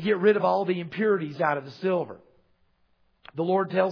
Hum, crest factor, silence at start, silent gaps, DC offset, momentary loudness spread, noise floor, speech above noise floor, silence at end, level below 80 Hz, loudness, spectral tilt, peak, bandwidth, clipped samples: none; 18 dB; 0 s; none; under 0.1%; 9 LU; -67 dBFS; 42 dB; 0 s; -74 dBFS; -25 LUFS; -8.5 dB/octave; -8 dBFS; 5.4 kHz; under 0.1%